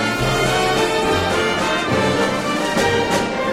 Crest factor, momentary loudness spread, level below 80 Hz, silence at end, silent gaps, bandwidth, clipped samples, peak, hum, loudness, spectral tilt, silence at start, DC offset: 12 dB; 2 LU; -38 dBFS; 0 s; none; 16.5 kHz; under 0.1%; -6 dBFS; none; -18 LUFS; -4 dB/octave; 0 s; under 0.1%